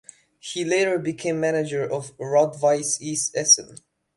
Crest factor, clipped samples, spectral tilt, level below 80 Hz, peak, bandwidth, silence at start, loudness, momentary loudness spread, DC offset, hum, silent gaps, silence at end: 20 dB; under 0.1%; -2.5 dB/octave; -68 dBFS; -4 dBFS; 11.5 kHz; 0.45 s; -22 LUFS; 12 LU; under 0.1%; none; none; 0.4 s